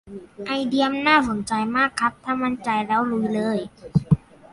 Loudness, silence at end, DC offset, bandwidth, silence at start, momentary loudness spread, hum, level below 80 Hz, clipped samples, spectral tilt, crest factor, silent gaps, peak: -22 LUFS; 0.35 s; under 0.1%; 11.5 kHz; 0.05 s; 8 LU; none; -48 dBFS; under 0.1%; -6 dB/octave; 18 dB; none; -4 dBFS